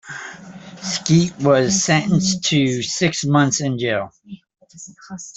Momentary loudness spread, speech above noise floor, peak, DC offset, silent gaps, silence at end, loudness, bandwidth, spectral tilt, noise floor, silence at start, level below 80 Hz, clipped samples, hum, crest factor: 21 LU; 20 dB; -2 dBFS; under 0.1%; none; 0.05 s; -18 LUFS; 8.4 kHz; -4.5 dB/octave; -38 dBFS; 0.05 s; -54 dBFS; under 0.1%; none; 16 dB